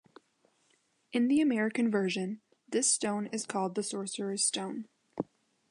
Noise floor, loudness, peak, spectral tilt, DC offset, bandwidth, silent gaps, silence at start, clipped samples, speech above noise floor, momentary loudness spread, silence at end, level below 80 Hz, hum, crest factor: -72 dBFS; -31 LUFS; -16 dBFS; -3.5 dB/octave; under 0.1%; 11 kHz; none; 1.15 s; under 0.1%; 41 dB; 14 LU; 0.45 s; -78 dBFS; none; 16 dB